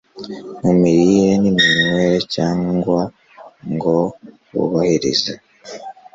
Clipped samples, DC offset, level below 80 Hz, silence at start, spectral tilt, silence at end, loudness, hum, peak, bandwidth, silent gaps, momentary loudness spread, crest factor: under 0.1%; under 0.1%; -50 dBFS; 0.15 s; -5.5 dB/octave; 0.25 s; -16 LUFS; none; -2 dBFS; 7.8 kHz; none; 20 LU; 16 dB